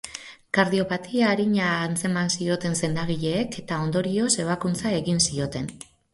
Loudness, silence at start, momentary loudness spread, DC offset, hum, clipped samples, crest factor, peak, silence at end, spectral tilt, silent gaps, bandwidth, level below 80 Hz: -24 LUFS; 0.05 s; 7 LU; under 0.1%; none; under 0.1%; 18 dB; -6 dBFS; 0.3 s; -4.5 dB/octave; none; 11.5 kHz; -54 dBFS